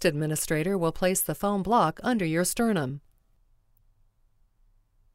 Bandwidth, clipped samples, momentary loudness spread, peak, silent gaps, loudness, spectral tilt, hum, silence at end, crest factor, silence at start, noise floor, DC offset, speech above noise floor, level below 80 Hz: 16 kHz; under 0.1%; 5 LU; -10 dBFS; none; -26 LUFS; -4.5 dB/octave; none; 2.15 s; 18 dB; 0 s; -65 dBFS; under 0.1%; 39 dB; -50 dBFS